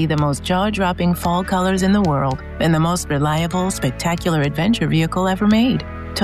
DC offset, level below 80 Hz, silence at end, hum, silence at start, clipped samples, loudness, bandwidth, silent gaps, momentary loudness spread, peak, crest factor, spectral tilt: 0.1%; -34 dBFS; 0 s; none; 0 s; under 0.1%; -18 LUFS; 14.5 kHz; none; 5 LU; -6 dBFS; 12 dB; -6 dB/octave